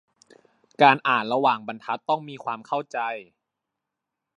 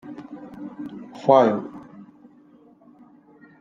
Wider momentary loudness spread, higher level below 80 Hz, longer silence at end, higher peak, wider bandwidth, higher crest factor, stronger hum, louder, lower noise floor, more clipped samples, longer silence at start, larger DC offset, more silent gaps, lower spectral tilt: second, 14 LU vs 23 LU; second, -82 dBFS vs -72 dBFS; second, 1.15 s vs 1.8 s; about the same, -2 dBFS vs -2 dBFS; first, 10.5 kHz vs 7.4 kHz; about the same, 24 dB vs 24 dB; neither; second, -23 LUFS vs -19 LUFS; first, -84 dBFS vs -53 dBFS; neither; first, 0.8 s vs 0.05 s; neither; neither; second, -5.5 dB/octave vs -7.5 dB/octave